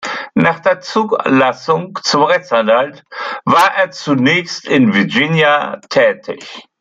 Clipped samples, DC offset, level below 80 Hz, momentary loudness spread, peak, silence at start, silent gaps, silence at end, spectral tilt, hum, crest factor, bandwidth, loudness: under 0.1%; under 0.1%; -60 dBFS; 10 LU; 0 dBFS; 0 s; none; 0.2 s; -5 dB/octave; none; 14 dB; 15.5 kHz; -13 LUFS